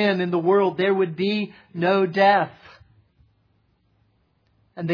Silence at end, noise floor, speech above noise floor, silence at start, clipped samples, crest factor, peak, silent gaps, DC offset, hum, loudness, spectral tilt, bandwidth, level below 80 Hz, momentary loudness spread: 0 s; -65 dBFS; 45 dB; 0 s; under 0.1%; 18 dB; -4 dBFS; none; under 0.1%; none; -21 LUFS; -8 dB/octave; 5.2 kHz; -68 dBFS; 11 LU